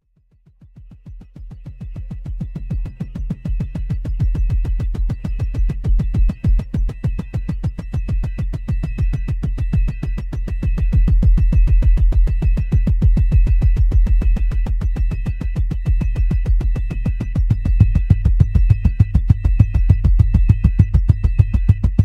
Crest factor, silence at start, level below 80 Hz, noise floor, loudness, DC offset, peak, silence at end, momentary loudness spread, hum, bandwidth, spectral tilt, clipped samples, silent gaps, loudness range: 16 dB; 0.75 s; -18 dBFS; -55 dBFS; -19 LUFS; under 0.1%; 0 dBFS; 0 s; 11 LU; none; 3.3 kHz; -9.5 dB/octave; under 0.1%; none; 9 LU